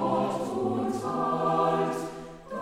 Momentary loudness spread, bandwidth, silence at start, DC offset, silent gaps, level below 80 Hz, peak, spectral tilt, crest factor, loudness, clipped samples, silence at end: 13 LU; 15.5 kHz; 0 s; under 0.1%; none; -60 dBFS; -12 dBFS; -6.5 dB/octave; 16 dB; -28 LUFS; under 0.1%; 0 s